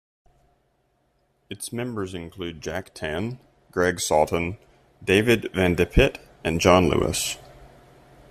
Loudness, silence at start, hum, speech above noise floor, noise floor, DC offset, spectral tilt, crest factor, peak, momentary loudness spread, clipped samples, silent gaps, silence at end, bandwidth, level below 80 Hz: -23 LUFS; 1.5 s; none; 45 dB; -68 dBFS; under 0.1%; -4.5 dB/octave; 22 dB; -2 dBFS; 15 LU; under 0.1%; none; 0.65 s; 15 kHz; -38 dBFS